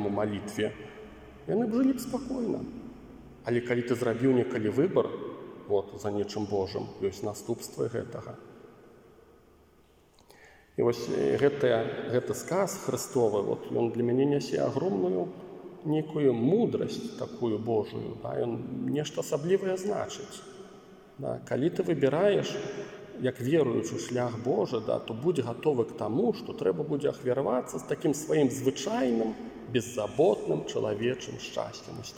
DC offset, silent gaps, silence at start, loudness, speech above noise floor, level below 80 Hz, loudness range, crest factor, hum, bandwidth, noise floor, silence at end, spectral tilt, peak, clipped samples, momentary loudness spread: under 0.1%; none; 0 s; -30 LUFS; 32 dB; -64 dBFS; 5 LU; 18 dB; none; 16.5 kHz; -61 dBFS; 0 s; -6 dB/octave; -12 dBFS; under 0.1%; 14 LU